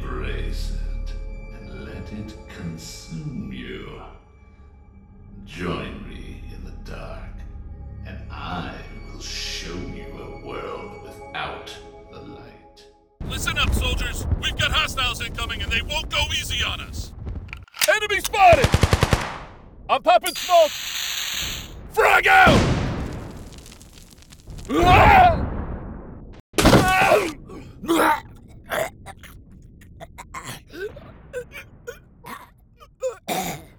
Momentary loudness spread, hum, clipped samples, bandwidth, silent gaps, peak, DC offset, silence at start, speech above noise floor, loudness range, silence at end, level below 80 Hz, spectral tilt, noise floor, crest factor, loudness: 24 LU; none; under 0.1%; over 20 kHz; 26.40-26.53 s; -4 dBFS; under 0.1%; 0 s; 35 dB; 18 LU; 0.1 s; -34 dBFS; -4 dB/octave; -51 dBFS; 20 dB; -20 LUFS